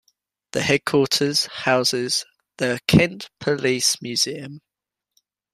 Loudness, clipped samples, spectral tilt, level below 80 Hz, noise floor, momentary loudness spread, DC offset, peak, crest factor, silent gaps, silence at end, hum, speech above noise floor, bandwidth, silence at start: -20 LUFS; under 0.1%; -3.5 dB/octave; -54 dBFS; -86 dBFS; 9 LU; under 0.1%; -2 dBFS; 22 dB; none; 0.95 s; none; 65 dB; 15.5 kHz; 0.55 s